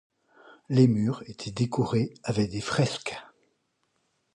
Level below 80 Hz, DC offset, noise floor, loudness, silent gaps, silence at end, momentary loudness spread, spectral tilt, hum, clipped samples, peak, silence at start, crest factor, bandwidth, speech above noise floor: -60 dBFS; under 0.1%; -74 dBFS; -27 LUFS; none; 1.1 s; 14 LU; -6.5 dB/octave; none; under 0.1%; -8 dBFS; 0.7 s; 20 dB; 11 kHz; 48 dB